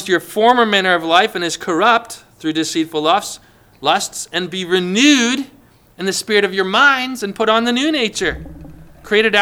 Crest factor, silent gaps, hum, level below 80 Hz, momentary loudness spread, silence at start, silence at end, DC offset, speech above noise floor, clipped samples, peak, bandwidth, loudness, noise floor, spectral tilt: 16 dB; none; none; -46 dBFS; 11 LU; 0 s; 0 s; under 0.1%; 21 dB; under 0.1%; 0 dBFS; 19.5 kHz; -15 LUFS; -37 dBFS; -3 dB/octave